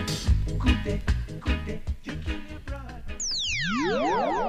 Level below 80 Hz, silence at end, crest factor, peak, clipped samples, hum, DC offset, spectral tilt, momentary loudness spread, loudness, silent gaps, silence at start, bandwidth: -32 dBFS; 0 s; 18 dB; -8 dBFS; under 0.1%; none; under 0.1%; -4.5 dB/octave; 13 LU; -28 LUFS; none; 0 s; 14.5 kHz